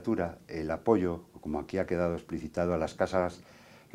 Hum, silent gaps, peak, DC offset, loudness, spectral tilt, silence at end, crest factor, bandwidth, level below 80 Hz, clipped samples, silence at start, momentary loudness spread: none; none; -12 dBFS; under 0.1%; -32 LUFS; -7.5 dB/octave; 0.15 s; 20 dB; 15.5 kHz; -56 dBFS; under 0.1%; 0 s; 10 LU